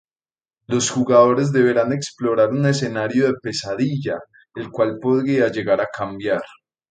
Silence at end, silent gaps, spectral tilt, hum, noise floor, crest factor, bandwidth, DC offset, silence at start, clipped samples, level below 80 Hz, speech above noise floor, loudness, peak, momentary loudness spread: 0.45 s; none; -5.5 dB/octave; none; under -90 dBFS; 18 dB; 9.4 kHz; under 0.1%; 0.7 s; under 0.1%; -60 dBFS; over 71 dB; -19 LUFS; -2 dBFS; 10 LU